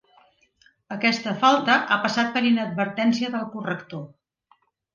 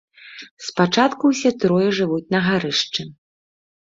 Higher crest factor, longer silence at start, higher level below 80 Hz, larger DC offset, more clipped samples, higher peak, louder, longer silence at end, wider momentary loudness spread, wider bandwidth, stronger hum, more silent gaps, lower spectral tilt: about the same, 20 dB vs 20 dB; first, 0.9 s vs 0.25 s; second, -72 dBFS vs -60 dBFS; neither; neither; about the same, -4 dBFS vs -2 dBFS; second, -22 LUFS vs -19 LUFS; about the same, 0.85 s vs 0.85 s; second, 15 LU vs 21 LU; about the same, 7.4 kHz vs 7.8 kHz; neither; second, none vs 0.51-0.57 s; about the same, -4.5 dB/octave vs -5 dB/octave